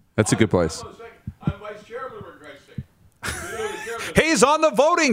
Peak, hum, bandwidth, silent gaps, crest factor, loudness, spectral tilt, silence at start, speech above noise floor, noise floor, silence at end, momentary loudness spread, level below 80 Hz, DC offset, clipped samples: -2 dBFS; none; 16 kHz; none; 20 dB; -21 LUFS; -4.5 dB/octave; 0.15 s; 25 dB; -44 dBFS; 0 s; 22 LU; -46 dBFS; under 0.1%; under 0.1%